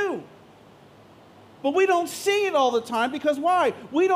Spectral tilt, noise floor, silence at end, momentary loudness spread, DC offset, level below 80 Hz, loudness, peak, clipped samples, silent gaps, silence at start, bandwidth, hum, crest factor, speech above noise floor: -3.5 dB/octave; -51 dBFS; 0 s; 6 LU; under 0.1%; -74 dBFS; -23 LUFS; -10 dBFS; under 0.1%; none; 0 s; 16 kHz; none; 14 dB; 29 dB